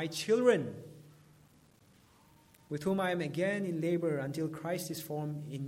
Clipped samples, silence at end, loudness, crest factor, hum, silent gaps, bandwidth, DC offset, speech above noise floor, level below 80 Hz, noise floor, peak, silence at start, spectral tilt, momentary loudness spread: under 0.1%; 0 s; -33 LUFS; 20 dB; none; none; 16.5 kHz; under 0.1%; 31 dB; -74 dBFS; -64 dBFS; -16 dBFS; 0 s; -5.5 dB/octave; 12 LU